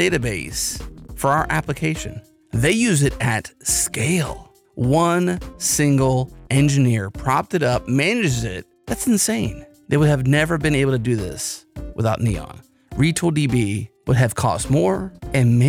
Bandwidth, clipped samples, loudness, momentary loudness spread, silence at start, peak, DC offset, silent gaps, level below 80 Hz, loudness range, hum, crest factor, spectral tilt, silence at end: 16.5 kHz; under 0.1%; -20 LUFS; 12 LU; 0 s; -6 dBFS; under 0.1%; none; -38 dBFS; 2 LU; none; 14 dB; -5 dB/octave; 0 s